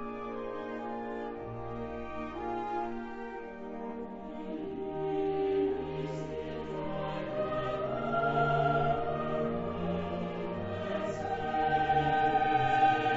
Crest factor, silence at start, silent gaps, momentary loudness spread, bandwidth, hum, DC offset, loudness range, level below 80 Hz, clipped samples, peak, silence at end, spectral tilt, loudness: 18 dB; 0 s; none; 13 LU; 7.6 kHz; none; under 0.1%; 8 LU; -54 dBFS; under 0.1%; -14 dBFS; 0 s; -5 dB/octave; -33 LUFS